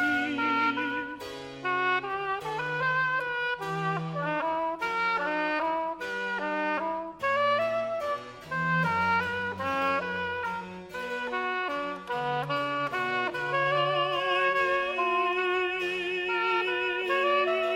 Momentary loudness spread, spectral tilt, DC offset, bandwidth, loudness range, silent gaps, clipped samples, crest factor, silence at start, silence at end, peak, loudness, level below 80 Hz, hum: 7 LU; -5 dB/octave; under 0.1%; 16 kHz; 4 LU; none; under 0.1%; 14 dB; 0 s; 0 s; -14 dBFS; -28 LUFS; -64 dBFS; none